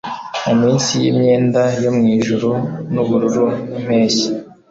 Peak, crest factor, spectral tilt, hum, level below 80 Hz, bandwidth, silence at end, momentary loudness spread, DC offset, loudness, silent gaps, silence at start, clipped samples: -4 dBFS; 12 dB; -5.5 dB/octave; none; -52 dBFS; 8 kHz; 0.2 s; 8 LU; under 0.1%; -16 LUFS; none; 0.05 s; under 0.1%